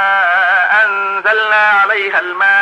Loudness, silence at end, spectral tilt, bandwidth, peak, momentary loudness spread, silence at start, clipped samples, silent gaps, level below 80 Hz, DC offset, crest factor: -11 LUFS; 0 s; -2 dB/octave; 9.8 kHz; -2 dBFS; 4 LU; 0 s; under 0.1%; none; -72 dBFS; under 0.1%; 10 dB